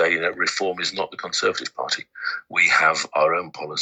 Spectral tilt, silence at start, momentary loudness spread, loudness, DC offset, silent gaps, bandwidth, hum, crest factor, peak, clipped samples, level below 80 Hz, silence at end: -1.5 dB/octave; 0 s; 12 LU; -21 LUFS; under 0.1%; none; 9.2 kHz; none; 18 dB; -4 dBFS; under 0.1%; -70 dBFS; 0 s